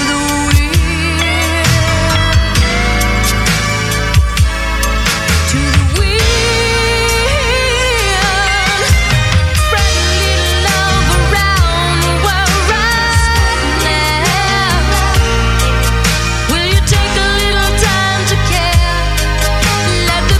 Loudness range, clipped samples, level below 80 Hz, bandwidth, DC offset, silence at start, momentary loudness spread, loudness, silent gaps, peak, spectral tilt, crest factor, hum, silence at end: 1 LU; under 0.1%; -16 dBFS; 16 kHz; under 0.1%; 0 s; 2 LU; -12 LUFS; none; 0 dBFS; -3.5 dB/octave; 12 dB; none; 0 s